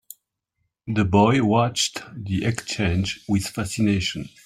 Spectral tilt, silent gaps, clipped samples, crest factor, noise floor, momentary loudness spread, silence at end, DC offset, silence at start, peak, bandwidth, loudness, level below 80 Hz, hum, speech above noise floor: -5 dB/octave; none; under 0.1%; 20 dB; -76 dBFS; 10 LU; 0.15 s; under 0.1%; 0.85 s; -4 dBFS; 15.5 kHz; -22 LUFS; -50 dBFS; none; 54 dB